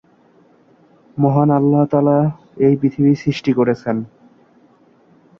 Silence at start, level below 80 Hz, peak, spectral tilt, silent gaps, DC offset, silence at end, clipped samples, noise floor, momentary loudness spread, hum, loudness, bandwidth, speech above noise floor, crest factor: 1.15 s; -56 dBFS; -2 dBFS; -9 dB/octave; none; under 0.1%; 1.35 s; under 0.1%; -52 dBFS; 9 LU; none; -16 LUFS; 6.8 kHz; 37 dB; 16 dB